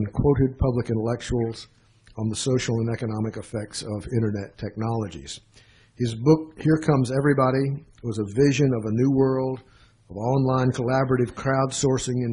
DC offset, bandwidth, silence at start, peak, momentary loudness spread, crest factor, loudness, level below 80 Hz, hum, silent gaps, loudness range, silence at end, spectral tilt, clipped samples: under 0.1%; 10.5 kHz; 0 s; -4 dBFS; 12 LU; 20 dB; -24 LUFS; -44 dBFS; none; none; 6 LU; 0 s; -6.5 dB/octave; under 0.1%